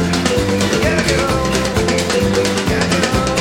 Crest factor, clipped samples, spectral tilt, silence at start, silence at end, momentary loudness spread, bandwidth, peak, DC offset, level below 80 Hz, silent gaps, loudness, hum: 14 dB; under 0.1%; -4.5 dB/octave; 0 s; 0 s; 1 LU; 16.5 kHz; 0 dBFS; under 0.1%; -30 dBFS; none; -15 LUFS; none